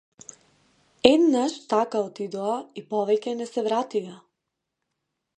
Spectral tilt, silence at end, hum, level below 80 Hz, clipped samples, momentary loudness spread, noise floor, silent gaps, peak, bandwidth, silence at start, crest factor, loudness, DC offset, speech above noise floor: -4.5 dB/octave; 1.2 s; none; -64 dBFS; under 0.1%; 17 LU; -82 dBFS; none; 0 dBFS; 9.8 kHz; 1.05 s; 26 dB; -24 LUFS; under 0.1%; 58 dB